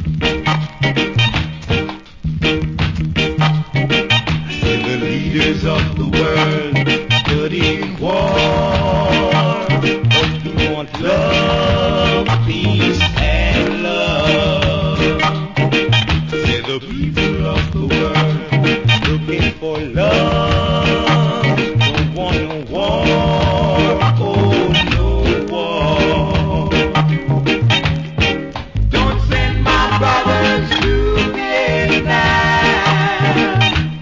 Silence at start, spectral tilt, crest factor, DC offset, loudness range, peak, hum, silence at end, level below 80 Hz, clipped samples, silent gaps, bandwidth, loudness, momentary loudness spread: 0 s; -6 dB/octave; 14 dB; under 0.1%; 2 LU; 0 dBFS; none; 0 s; -26 dBFS; under 0.1%; none; 7.6 kHz; -15 LUFS; 5 LU